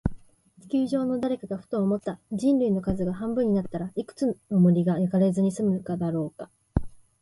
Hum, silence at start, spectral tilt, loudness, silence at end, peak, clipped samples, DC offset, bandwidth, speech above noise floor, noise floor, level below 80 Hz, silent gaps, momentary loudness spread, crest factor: none; 0.05 s; -9 dB/octave; -26 LUFS; 0.25 s; -6 dBFS; under 0.1%; under 0.1%; 11.5 kHz; 30 dB; -55 dBFS; -46 dBFS; none; 10 LU; 20 dB